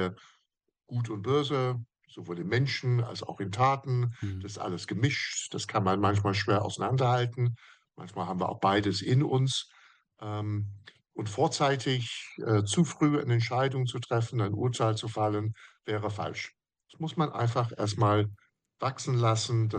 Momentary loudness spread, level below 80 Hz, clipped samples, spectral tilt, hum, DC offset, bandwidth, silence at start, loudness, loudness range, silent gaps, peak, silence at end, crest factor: 11 LU; -68 dBFS; under 0.1%; -5.5 dB/octave; none; under 0.1%; 10 kHz; 0 s; -29 LUFS; 3 LU; none; -12 dBFS; 0 s; 18 dB